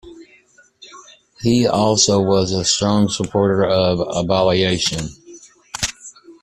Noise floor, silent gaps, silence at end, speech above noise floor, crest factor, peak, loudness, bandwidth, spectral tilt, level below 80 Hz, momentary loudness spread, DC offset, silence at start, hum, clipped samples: -52 dBFS; none; 0.1 s; 36 dB; 18 dB; -2 dBFS; -17 LUFS; 13.5 kHz; -4 dB/octave; -46 dBFS; 11 LU; under 0.1%; 0.05 s; none; under 0.1%